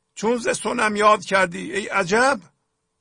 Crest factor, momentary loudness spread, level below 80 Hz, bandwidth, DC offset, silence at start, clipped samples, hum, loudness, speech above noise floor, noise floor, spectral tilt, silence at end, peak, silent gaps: 16 dB; 7 LU; -58 dBFS; 10.5 kHz; under 0.1%; 0.15 s; under 0.1%; none; -20 LUFS; 52 dB; -72 dBFS; -3.5 dB/octave; 0.6 s; -4 dBFS; none